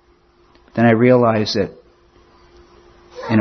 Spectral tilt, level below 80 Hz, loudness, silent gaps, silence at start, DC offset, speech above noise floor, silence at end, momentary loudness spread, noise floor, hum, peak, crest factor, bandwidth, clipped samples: -7 dB/octave; -54 dBFS; -16 LUFS; none; 0.75 s; under 0.1%; 40 dB; 0 s; 15 LU; -54 dBFS; none; 0 dBFS; 18 dB; 6.4 kHz; under 0.1%